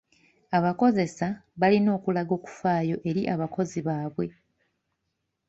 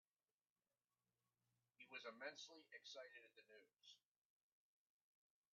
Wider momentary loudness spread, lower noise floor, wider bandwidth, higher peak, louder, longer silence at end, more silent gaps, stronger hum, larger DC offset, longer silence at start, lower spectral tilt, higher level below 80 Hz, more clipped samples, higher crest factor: second, 10 LU vs 13 LU; second, -80 dBFS vs under -90 dBFS; first, 8 kHz vs 7.2 kHz; first, -8 dBFS vs -40 dBFS; first, -26 LUFS vs -60 LUFS; second, 1.2 s vs 1.55 s; neither; neither; neither; second, 0.5 s vs 1.8 s; first, -7.5 dB/octave vs 1 dB/octave; first, -64 dBFS vs under -90 dBFS; neither; second, 18 dB vs 24 dB